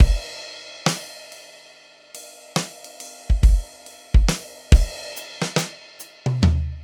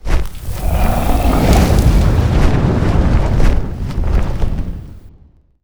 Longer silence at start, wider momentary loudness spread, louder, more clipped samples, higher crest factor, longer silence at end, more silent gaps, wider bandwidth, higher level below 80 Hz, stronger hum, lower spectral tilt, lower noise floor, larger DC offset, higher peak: about the same, 0 s vs 0.05 s; first, 21 LU vs 11 LU; second, -23 LUFS vs -16 LUFS; neither; first, 20 dB vs 12 dB; second, 0 s vs 0.55 s; neither; second, 17.5 kHz vs over 20 kHz; second, -22 dBFS vs -16 dBFS; neither; second, -5 dB/octave vs -7 dB/octave; about the same, -49 dBFS vs -46 dBFS; neither; about the same, 0 dBFS vs 0 dBFS